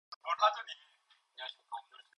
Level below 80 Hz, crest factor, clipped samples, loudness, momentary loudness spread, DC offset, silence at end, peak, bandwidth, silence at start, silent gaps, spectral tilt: under -90 dBFS; 24 dB; under 0.1%; -35 LUFS; 18 LU; under 0.1%; 0.15 s; -16 dBFS; 11 kHz; 0.1 s; 0.16-0.21 s; 2.5 dB/octave